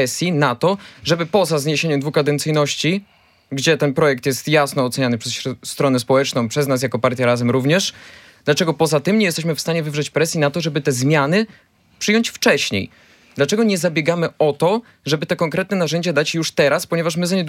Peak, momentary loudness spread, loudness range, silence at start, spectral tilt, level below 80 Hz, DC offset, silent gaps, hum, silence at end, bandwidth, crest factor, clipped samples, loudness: -2 dBFS; 6 LU; 1 LU; 0 s; -4.5 dB/octave; -62 dBFS; under 0.1%; none; none; 0 s; 16.5 kHz; 18 dB; under 0.1%; -18 LUFS